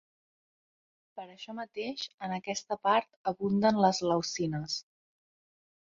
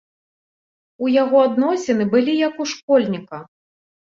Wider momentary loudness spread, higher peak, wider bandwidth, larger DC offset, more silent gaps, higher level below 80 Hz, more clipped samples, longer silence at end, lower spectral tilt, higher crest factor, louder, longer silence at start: first, 17 LU vs 12 LU; second, -12 dBFS vs -4 dBFS; about the same, 7.8 kHz vs 7.6 kHz; neither; first, 2.14-2.18 s, 3.16-3.25 s vs 2.83-2.88 s; about the same, -70 dBFS vs -66 dBFS; neither; first, 1.05 s vs 0.7 s; about the same, -4.5 dB/octave vs -5.5 dB/octave; about the same, 20 dB vs 16 dB; second, -31 LUFS vs -18 LUFS; first, 1.15 s vs 1 s